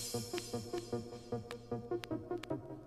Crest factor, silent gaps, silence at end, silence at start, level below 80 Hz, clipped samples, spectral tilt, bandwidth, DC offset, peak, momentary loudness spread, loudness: 22 dB; none; 0 s; 0 s; -64 dBFS; under 0.1%; -5 dB/octave; 15.5 kHz; under 0.1%; -20 dBFS; 4 LU; -43 LUFS